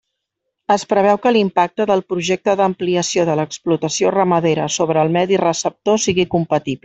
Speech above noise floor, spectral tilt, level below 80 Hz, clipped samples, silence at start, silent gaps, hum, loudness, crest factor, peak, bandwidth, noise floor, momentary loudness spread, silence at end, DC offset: 60 dB; -4.5 dB/octave; -56 dBFS; under 0.1%; 0.7 s; none; none; -17 LUFS; 14 dB; -2 dBFS; 8.4 kHz; -76 dBFS; 5 LU; 0.1 s; under 0.1%